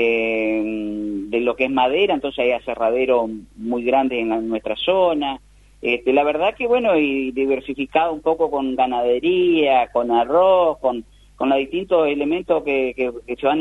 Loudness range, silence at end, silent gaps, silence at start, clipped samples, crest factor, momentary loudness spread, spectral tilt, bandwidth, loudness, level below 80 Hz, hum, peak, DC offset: 2 LU; 0 s; none; 0 s; under 0.1%; 16 dB; 8 LU; -6.5 dB/octave; 11 kHz; -19 LUFS; -50 dBFS; none; -4 dBFS; under 0.1%